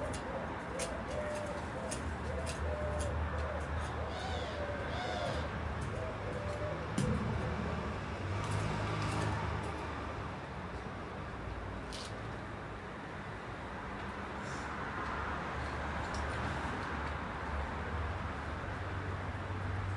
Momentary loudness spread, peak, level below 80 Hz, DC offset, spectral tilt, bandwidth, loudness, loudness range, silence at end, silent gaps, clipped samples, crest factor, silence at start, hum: 7 LU; -22 dBFS; -48 dBFS; under 0.1%; -5.5 dB/octave; 11.5 kHz; -39 LUFS; 6 LU; 0 s; none; under 0.1%; 16 dB; 0 s; none